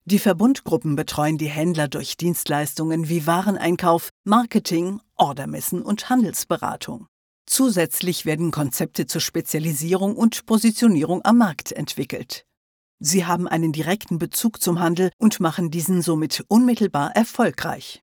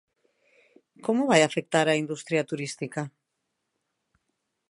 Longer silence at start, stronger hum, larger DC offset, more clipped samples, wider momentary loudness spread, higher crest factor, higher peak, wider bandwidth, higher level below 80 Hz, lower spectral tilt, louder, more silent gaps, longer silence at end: second, 0.05 s vs 1.05 s; neither; neither; neither; second, 8 LU vs 13 LU; second, 18 dB vs 24 dB; about the same, -4 dBFS vs -4 dBFS; first, over 20 kHz vs 11.5 kHz; first, -60 dBFS vs -78 dBFS; about the same, -5 dB/octave vs -4.5 dB/octave; first, -21 LUFS vs -26 LUFS; first, 4.11-4.24 s, 7.08-7.45 s, 12.57-12.98 s, 15.13-15.19 s vs none; second, 0.05 s vs 1.6 s